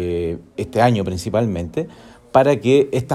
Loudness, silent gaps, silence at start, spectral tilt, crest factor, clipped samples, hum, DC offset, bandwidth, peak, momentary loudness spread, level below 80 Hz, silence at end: -19 LUFS; none; 0 s; -7 dB/octave; 18 dB; under 0.1%; none; under 0.1%; 13.5 kHz; 0 dBFS; 12 LU; -44 dBFS; 0 s